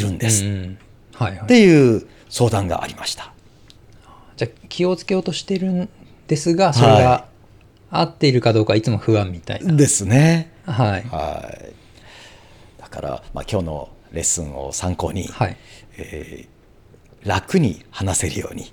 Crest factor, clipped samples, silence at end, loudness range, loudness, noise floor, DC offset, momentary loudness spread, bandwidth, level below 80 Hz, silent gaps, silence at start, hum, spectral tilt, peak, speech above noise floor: 18 dB; under 0.1%; 0.05 s; 9 LU; -18 LUFS; -49 dBFS; under 0.1%; 18 LU; 18.5 kHz; -44 dBFS; none; 0 s; none; -5 dB/octave; -2 dBFS; 31 dB